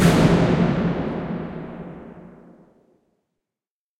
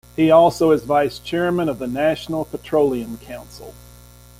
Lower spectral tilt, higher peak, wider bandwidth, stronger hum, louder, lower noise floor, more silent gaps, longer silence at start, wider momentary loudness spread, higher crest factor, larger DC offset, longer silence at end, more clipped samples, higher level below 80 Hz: about the same, -7 dB/octave vs -6 dB/octave; about the same, -4 dBFS vs -2 dBFS; about the same, 15.5 kHz vs 16.5 kHz; second, none vs 60 Hz at -40 dBFS; about the same, -20 LUFS vs -18 LUFS; first, under -90 dBFS vs -44 dBFS; neither; second, 0 s vs 0.2 s; about the same, 21 LU vs 21 LU; about the same, 20 dB vs 16 dB; neither; first, 1.7 s vs 0.7 s; neither; first, -40 dBFS vs -48 dBFS